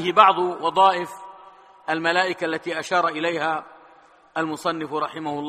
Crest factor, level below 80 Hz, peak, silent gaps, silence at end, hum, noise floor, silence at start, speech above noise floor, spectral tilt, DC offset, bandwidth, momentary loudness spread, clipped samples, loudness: 22 dB; -70 dBFS; 0 dBFS; none; 0 s; none; -52 dBFS; 0 s; 31 dB; -4 dB/octave; under 0.1%; 14.5 kHz; 15 LU; under 0.1%; -22 LUFS